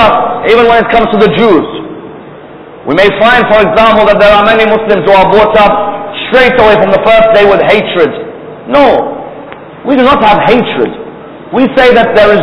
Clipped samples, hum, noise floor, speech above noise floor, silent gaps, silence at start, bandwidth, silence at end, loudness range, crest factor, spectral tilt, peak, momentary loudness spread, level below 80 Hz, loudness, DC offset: 6%; none; -28 dBFS; 23 dB; none; 0 s; 5.4 kHz; 0 s; 3 LU; 6 dB; -7 dB/octave; 0 dBFS; 17 LU; -32 dBFS; -6 LUFS; 1%